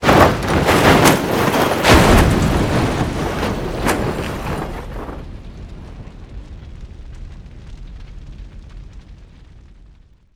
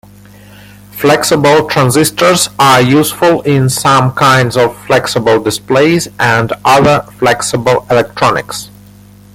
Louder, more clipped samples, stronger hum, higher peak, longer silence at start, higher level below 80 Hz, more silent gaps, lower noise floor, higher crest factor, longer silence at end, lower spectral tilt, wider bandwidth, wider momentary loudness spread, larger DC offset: second, -15 LUFS vs -9 LUFS; neither; second, none vs 50 Hz at -35 dBFS; about the same, 0 dBFS vs 0 dBFS; second, 0 s vs 0.95 s; first, -28 dBFS vs -42 dBFS; neither; first, -47 dBFS vs -37 dBFS; first, 18 dB vs 10 dB; first, 1.1 s vs 0.7 s; about the same, -5 dB/octave vs -4.5 dB/octave; first, over 20 kHz vs 17 kHz; first, 26 LU vs 5 LU; neither